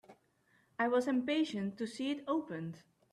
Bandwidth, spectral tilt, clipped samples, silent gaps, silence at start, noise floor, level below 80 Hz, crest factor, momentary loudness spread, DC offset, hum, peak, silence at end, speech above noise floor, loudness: 12.5 kHz; -5.5 dB/octave; under 0.1%; none; 0.1 s; -72 dBFS; -80 dBFS; 16 dB; 13 LU; under 0.1%; none; -22 dBFS; 0.35 s; 37 dB; -36 LUFS